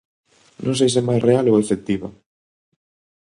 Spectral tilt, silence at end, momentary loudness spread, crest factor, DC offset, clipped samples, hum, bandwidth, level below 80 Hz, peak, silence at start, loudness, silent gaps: -6 dB/octave; 1.15 s; 11 LU; 18 dB; under 0.1%; under 0.1%; none; 11 kHz; -54 dBFS; -2 dBFS; 0.6 s; -19 LUFS; none